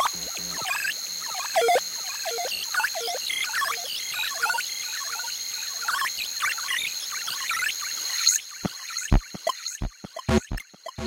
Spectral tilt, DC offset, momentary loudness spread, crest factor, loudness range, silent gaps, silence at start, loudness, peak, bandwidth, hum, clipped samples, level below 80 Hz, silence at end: -2 dB/octave; under 0.1%; 9 LU; 22 dB; 2 LU; none; 0 s; -26 LUFS; -6 dBFS; 16 kHz; none; under 0.1%; -38 dBFS; 0 s